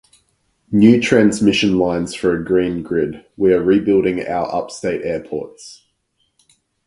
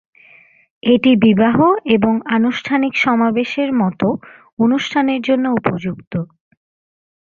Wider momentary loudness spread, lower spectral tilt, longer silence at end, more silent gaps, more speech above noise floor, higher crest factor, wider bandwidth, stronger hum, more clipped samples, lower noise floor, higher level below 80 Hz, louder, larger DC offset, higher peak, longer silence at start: about the same, 11 LU vs 12 LU; about the same, -6 dB/octave vs -7 dB/octave; about the same, 1.15 s vs 1.05 s; second, none vs 4.53-4.57 s, 6.07-6.11 s; first, 51 dB vs 33 dB; about the same, 18 dB vs 14 dB; first, 11.5 kHz vs 7.2 kHz; neither; neither; first, -67 dBFS vs -48 dBFS; first, -48 dBFS vs -54 dBFS; about the same, -17 LUFS vs -16 LUFS; neither; about the same, 0 dBFS vs -2 dBFS; second, 0.7 s vs 0.85 s